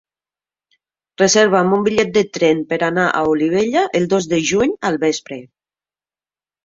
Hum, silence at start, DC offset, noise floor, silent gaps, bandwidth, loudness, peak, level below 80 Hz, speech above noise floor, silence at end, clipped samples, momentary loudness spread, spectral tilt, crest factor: none; 1.2 s; under 0.1%; under -90 dBFS; none; 7.8 kHz; -16 LUFS; -2 dBFS; -54 dBFS; over 74 dB; 1.2 s; under 0.1%; 6 LU; -4 dB/octave; 16 dB